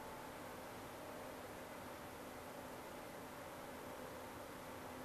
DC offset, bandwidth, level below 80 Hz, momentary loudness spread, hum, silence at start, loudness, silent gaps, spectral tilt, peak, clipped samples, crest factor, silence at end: under 0.1%; 14 kHz; -70 dBFS; 1 LU; none; 0 s; -52 LUFS; none; -4 dB/octave; -38 dBFS; under 0.1%; 12 dB; 0 s